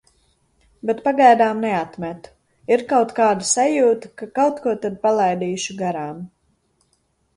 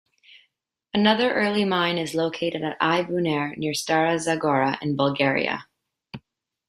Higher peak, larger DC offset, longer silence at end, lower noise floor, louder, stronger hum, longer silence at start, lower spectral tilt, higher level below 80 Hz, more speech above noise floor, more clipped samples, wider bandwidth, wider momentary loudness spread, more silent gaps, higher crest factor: first, 0 dBFS vs -4 dBFS; neither; first, 1.1 s vs 0.5 s; second, -66 dBFS vs -73 dBFS; first, -19 LUFS vs -23 LUFS; neither; about the same, 0.85 s vs 0.95 s; about the same, -4 dB/octave vs -5 dB/octave; about the same, -62 dBFS vs -64 dBFS; about the same, 47 dB vs 50 dB; neither; second, 11.5 kHz vs 15 kHz; first, 17 LU vs 8 LU; neither; about the same, 20 dB vs 20 dB